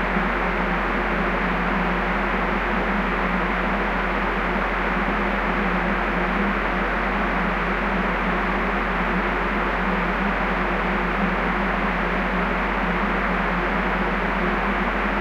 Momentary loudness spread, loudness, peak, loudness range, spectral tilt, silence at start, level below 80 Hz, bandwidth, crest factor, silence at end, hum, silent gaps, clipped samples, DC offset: 1 LU; -22 LUFS; -8 dBFS; 0 LU; -7 dB/octave; 0 s; -30 dBFS; 8 kHz; 14 dB; 0 s; none; none; under 0.1%; under 0.1%